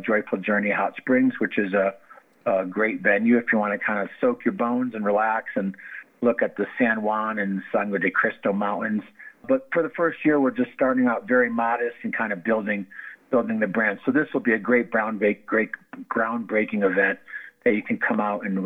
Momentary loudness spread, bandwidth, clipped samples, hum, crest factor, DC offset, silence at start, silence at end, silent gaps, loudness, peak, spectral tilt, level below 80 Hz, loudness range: 7 LU; 3.9 kHz; under 0.1%; none; 18 dB; under 0.1%; 0 s; 0 s; none; -23 LUFS; -6 dBFS; -9 dB/octave; -76 dBFS; 2 LU